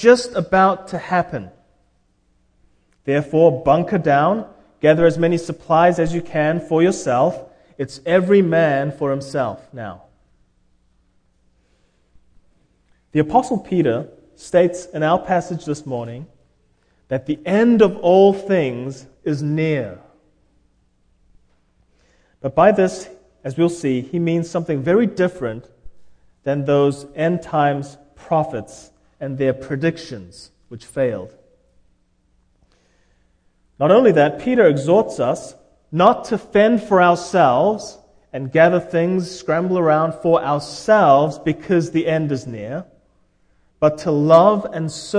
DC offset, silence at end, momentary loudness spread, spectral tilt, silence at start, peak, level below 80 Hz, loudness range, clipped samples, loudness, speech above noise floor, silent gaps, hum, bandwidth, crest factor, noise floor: under 0.1%; 0 s; 16 LU; -6.5 dB/octave; 0 s; 0 dBFS; -52 dBFS; 9 LU; under 0.1%; -17 LUFS; 44 dB; none; none; 10.5 kHz; 18 dB; -61 dBFS